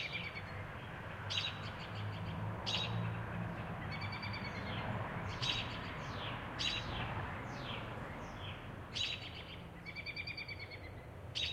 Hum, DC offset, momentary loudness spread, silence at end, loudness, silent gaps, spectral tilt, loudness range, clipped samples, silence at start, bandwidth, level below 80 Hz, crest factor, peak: none; under 0.1%; 10 LU; 0 s; -42 LUFS; none; -4.5 dB/octave; 3 LU; under 0.1%; 0 s; 15.5 kHz; -56 dBFS; 20 dB; -22 dBFS